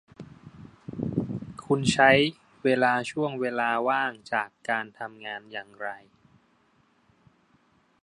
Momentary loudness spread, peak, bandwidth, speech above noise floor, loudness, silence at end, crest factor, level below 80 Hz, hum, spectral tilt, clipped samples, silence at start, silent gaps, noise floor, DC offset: 20 LU; -4 dBFS; 11.5 kHz; 39 dB; -26 LUFS; 2.05 s; 24 dB; -62 dBFS; none; -5 dB/octave; under 0.1%; 0.2 s; none; -65 dBFS; under 0.1%